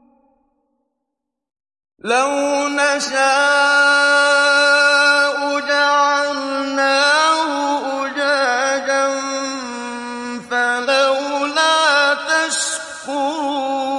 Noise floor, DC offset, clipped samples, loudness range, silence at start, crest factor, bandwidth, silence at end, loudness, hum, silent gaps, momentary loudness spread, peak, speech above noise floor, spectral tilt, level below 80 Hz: -79 dBFS; under 0.1%; under 0.1%; 6 LU; 2.05 s; 14 dB; 11.5 kHz; 0 s; -15 LUFS; none; none; 10 LU; -4 dBFS; 65 dB; 0 dB/octave; -68 dBFS